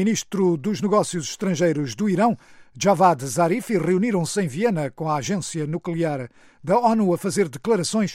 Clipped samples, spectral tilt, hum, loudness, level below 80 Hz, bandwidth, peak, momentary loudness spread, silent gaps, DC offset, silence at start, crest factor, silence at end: under 0.1%; -5.5 dB/octave; none; -22 LUFS; -62 dBFS; 15.5 kHz; -4 dBFS; 8 LU; none; under 0.1%; 0 s; 18 dB; 0 s